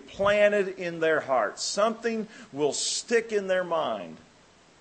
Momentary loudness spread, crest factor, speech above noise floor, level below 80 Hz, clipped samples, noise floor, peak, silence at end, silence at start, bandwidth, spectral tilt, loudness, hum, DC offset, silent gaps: 10 LU; 18 dB; 31 dB; -64 dBFS; under 0.1%; -57 dBFS; -10 dBFS; 0.6 s; 0.05 s; 8.8 kHz; -2.5 dB/octave; -26 LUFS; none; under 0.1%; none